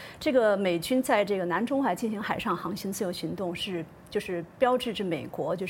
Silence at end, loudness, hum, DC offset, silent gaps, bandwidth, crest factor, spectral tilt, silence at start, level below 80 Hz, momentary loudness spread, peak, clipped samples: 0 s; -28 LUFS; none; under 0.1%; none; 17 kHz; 18 dB; -5 dB/octave; 0 s; -60 dBFS; 9 LU; -10 dBFS; under 0.1%